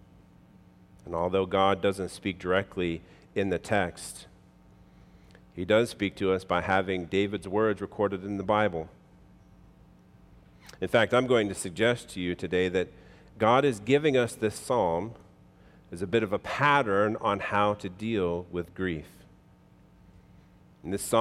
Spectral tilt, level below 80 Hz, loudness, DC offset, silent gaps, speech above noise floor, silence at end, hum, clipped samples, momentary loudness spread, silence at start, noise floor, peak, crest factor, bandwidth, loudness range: -5 dB/octave; -60 dBFS; -28 LUFS; under 0.1%; none; 30 dB; 0 s; none; under 0.1%; 13 LU; 1.05 s; -57 dBFS; -8 dBFS; 20 dB; 15.5 kHz; 5 LU